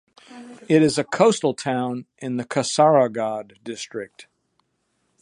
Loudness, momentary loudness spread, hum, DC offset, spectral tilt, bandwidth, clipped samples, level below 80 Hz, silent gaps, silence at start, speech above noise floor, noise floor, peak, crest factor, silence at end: -21 LUFS; 18 LU; none; under 0.1%; -5 dB/octave; 11 kHz; under 0.1%; -68 dBFS; none; 0.3 s; 50 dB; -71 dBFS; -2 dBFS; 20 dB; 1 s